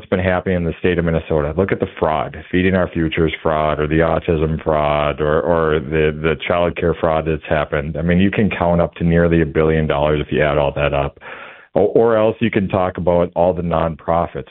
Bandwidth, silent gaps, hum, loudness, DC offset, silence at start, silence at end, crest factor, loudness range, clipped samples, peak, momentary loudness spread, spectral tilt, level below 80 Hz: 4.1 kHz; none; none; -17 LUFS; 0.1%; 0 s; 0.05 s; 16 dB; 2 LU; under 0.1%; -2 dBFS; 4 LU; -12 dB/octave; -34 dBFS